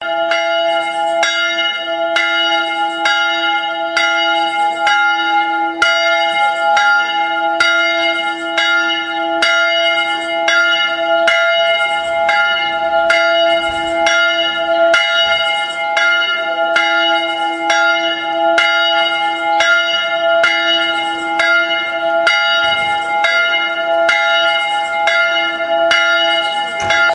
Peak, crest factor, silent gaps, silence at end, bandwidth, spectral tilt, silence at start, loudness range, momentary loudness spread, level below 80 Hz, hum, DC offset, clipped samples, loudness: 0 dBFS; 14 dB; none; 0 s; 11 kHz; -1 dB/octave; 0 s; 1 LU; 4 LU; -54 dBFS; none; under 0.1%; under 0.1%; -13 LUFS